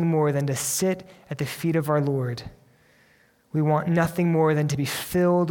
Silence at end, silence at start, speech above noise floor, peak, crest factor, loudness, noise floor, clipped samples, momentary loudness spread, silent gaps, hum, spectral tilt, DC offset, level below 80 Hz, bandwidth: 0 s; 0 s; 37 dB; -8 dBFS; 16 dB; -24 LUFS; -60 dBFS; under 0.1%; 10 LU; none; none; -6 dB/octave; under 0.1%; -56 dBFS; 18.5 kHz